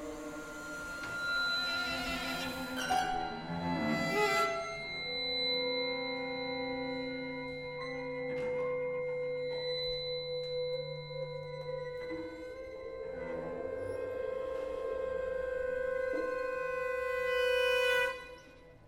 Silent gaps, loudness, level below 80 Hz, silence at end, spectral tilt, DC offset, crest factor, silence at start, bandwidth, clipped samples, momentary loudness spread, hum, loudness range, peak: none; -35 LUFS; -60 dBFS; 0 s; -4 dB/octave; under 0.1%; 18 dB; 0 s; 16.5 kHz; under 0.1%; 11 LU; none; 7 LU; -18 dBFS